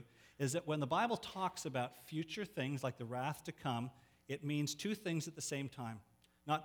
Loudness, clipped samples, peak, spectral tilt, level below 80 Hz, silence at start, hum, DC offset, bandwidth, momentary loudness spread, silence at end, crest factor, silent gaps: -41 LUFS; under 0.1%; -22 dBFS; -5 dB/octave; -76 dBFS; 0 s; none; under 0.1%; over 20 kHz; 9 LU; 0 s; 20 dB; none